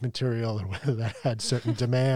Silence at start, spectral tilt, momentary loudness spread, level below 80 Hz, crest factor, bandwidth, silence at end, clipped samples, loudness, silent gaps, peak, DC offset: 0 s; -6 dB/octave; 4 LU; -60 dBFS; 12 dB; 11.5 kHz; 0 s; under 0.1%; -28 LUFS; none; -14 dBFS; under 0.1%